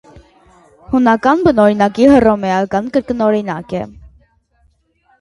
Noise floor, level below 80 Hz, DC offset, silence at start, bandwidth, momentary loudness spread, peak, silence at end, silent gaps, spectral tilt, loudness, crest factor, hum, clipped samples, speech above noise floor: -57 dBFS; -42 dBFS; under 0.1%; 0.15 s; 11.5 kHz; 13 LU; 0 dBFS; 1.15 s; none; -7 dB/octave; -13 LUFS; 14 dB; none; under 0.1%; 45 dB